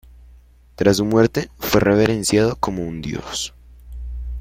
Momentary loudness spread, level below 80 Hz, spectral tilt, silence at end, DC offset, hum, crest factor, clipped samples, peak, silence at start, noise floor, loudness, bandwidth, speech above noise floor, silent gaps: 15 LU; -36 dBFS; -5 dB/octave; 0 s; under 0.1%; 60 Hz at -40 dBFS; 18 dB; under 0.1%; -2 dBFS; 0.2 s; -48 dBFS; -19 LUFS; 16.5 kHz; 30 dB; none